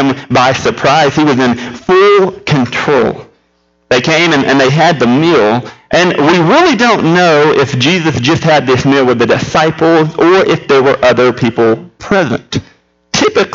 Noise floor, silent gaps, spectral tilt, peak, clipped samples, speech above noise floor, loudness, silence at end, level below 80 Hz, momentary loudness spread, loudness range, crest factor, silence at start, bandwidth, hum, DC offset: -56 dBFS; none; -5 dB/octave; 0 dBFS; under 0.1%; 47 dB; -9 LUFS; 0 s; -42 dBFS; 6 LU; 2 LU; 10 dB; 0 s; 7.8 kHz; none; under 0.1%